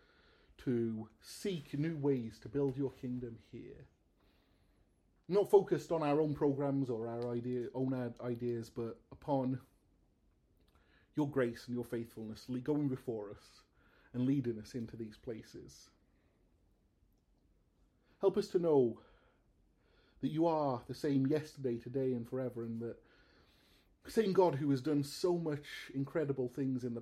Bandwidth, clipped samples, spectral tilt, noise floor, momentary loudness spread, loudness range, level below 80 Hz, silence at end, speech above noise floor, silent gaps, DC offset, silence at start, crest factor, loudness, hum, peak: 14.5 kHz; under 0.1%; -7.5 dB/octave; -73 dBFS; 15 LU; 8 LU; -70 dBFS; 0 s; 37 dB; none; under 0.1%; 0.6 s; 22 dB; -37 LUFS; none; -16 dBFS